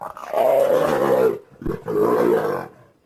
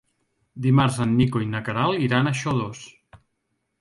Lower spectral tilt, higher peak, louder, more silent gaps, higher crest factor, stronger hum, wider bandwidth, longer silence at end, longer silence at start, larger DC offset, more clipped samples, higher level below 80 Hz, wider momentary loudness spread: about the same, -6.5 dB/octave vs -6.5 dB/octave; about the same, -6 dBFS vs -6 dBFS; about the same, -20 LUFS vs -22 LUFS; neither; about the same, 14 dB vs 18 dB; neither; first, 16 kHz vs 11.5 kHz; second, 0.4 s vs 0.65 s; second, 0 s vs 0.55 s; neither; neither; first, -46 dBFS vs -52 dBFS; first, 12 LU vs 8 LU